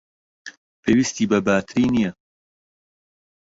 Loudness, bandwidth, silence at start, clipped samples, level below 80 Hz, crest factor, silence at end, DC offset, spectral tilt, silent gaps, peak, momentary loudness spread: -20 LUFS; 8 kHz; 0.45 s; under 0.1%; -52 dBFS; 18 dB; 1.5 s; under 0.1%; -5 dB/octave; 0.57-0.83 s; -4 dBFS; 22 LU